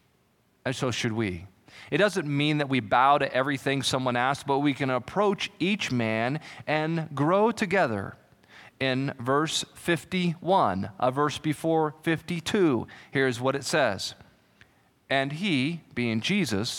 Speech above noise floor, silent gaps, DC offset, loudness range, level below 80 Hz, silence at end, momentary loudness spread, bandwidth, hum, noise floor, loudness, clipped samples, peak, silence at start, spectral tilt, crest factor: 40 dB; none; under 0.1%; 3 LU; -64 dBFS; 0 s; 7 LU; 17.5 kHz; none; -66 dBFS; -26 LUFS; under 0.1%; -8 dBFS; 0.65 s; -5 dB/octave; 18 dB